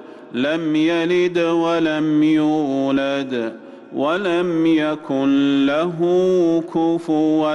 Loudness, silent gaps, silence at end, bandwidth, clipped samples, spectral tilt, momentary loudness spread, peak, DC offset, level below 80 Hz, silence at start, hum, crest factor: -18 LUFS; none; 0 s; 9 kHz; under 0.1%; -6.5 dB/octave; 7 LU; -10 dBFS; under 0.1%; -60 dBFS; 0 s; none; 8 dB